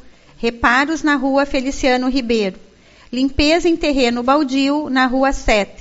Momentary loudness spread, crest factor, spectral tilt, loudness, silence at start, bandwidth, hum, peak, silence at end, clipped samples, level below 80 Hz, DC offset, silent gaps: 6 LU; 16 dB; -2.5 dB/octave; -16 LUFS; 0.05 s; 8 kHz; none; 0 dBFS; 0.1 s; under 0.1%; -34 dBFS; under 0.1%; none